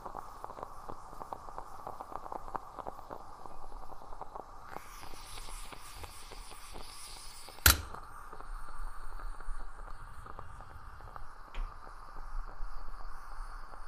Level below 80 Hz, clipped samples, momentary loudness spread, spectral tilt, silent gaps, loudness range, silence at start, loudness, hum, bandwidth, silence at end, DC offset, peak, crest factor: -44 dBFS; under 0.1%; 7 LU; -2 dB/octave; none; 15 LU; 0 s; -40 LUFS; none; 15.5 kHz; 0 s; under 0.1%; -6 dBFS; 34 dB